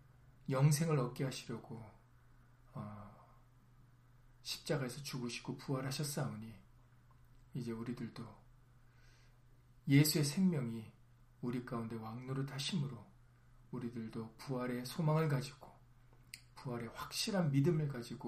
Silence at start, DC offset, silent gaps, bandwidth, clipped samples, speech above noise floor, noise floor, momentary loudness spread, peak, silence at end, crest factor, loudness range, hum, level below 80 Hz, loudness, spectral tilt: 0.25 s; under 0.1%; none; 15.5 kHz; under 0.1%; 27 dB; -64 dBFS; 20 LU; -16 dBFS; 0 s; 24 dB; 11 LU; none; -68 dBFS; -39 LUFS; -5.5 dB/octave